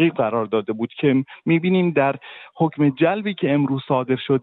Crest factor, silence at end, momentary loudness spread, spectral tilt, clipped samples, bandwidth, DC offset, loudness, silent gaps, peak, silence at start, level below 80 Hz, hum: 14 dB; 0 s; 5 LU; -11 dB/octave; under 0.1%; 4.2 kHz; under 0.1%; -20 LUFS; none; -6 dBFS; 0 s; -64 dBFS; none